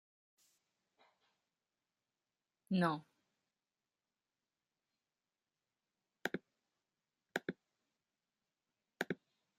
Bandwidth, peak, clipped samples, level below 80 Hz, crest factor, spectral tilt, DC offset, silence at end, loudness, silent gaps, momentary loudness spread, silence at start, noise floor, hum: 13 kHz; -20 dBFS; under 0.1%; -88 dBFS; 28 dB; -6 dB/octave; under 0.1%; 0.45 s; -42 LUFS; none; 13 LU; 2.7 s; under -90 dBFS; none